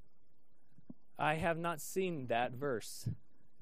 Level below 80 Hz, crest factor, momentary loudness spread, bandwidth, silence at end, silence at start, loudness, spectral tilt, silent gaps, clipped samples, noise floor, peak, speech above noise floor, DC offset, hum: -66 dBFS; 22 dB; 10 LU; 15.5 kHz; 0.45 s; 0.9 s; -38 LUFS; -5 dB/octave; none; under 0.1%; -77 dBFS; -18 dBFS; 40 dB; 0.4%; none